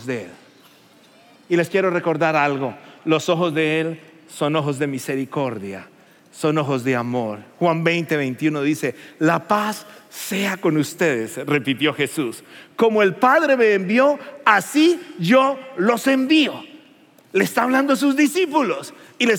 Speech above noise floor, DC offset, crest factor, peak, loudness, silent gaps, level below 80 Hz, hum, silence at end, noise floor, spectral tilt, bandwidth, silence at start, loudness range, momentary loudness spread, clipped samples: 32 dB; under 0.1%; 20 dB; 0 dBFS; -19 LUFS; none; -80 dBFS; none; 0 s; -51 dBFS; -5 dB/octave; 17 kHz; 0 s; 6 LU; 13 LU; under 0.1%